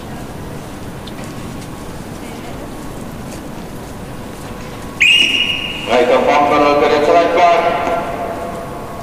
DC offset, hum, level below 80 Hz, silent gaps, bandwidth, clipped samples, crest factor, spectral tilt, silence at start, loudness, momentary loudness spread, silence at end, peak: under 0.1%; none; -38 dBFS; none; 15.5 kHz; under 0.1%; 16 dB; -4 dB/octave; 0 s; -12 LUFS; 18 LU; 0 s; 0 dBFS